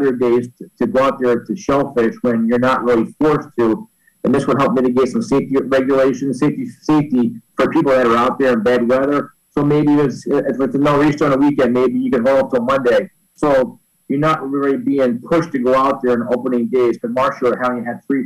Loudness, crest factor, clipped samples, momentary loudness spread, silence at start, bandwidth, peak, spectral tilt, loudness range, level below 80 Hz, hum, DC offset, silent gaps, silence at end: -16 LUFS; 8 dB; under 0.1%; 5 LU; 0 s; 12.5 kHz; -8 dBFS; -7 dB/octave; 2 LU; -48 dBFS; none; under 0.1%; none; 0 s